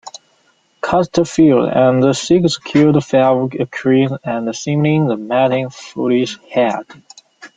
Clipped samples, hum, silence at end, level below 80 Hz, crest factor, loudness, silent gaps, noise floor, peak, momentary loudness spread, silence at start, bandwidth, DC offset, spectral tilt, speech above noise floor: under 0.1%; none; 0.1 s; -52 dBFS; 14 dB; -15 LUFS; none; -57 dBFS; -2 dBFS; 9 LU; 0.05 s; 9.2 kHz; under 0.1%; -6 dB/octave; 43 dB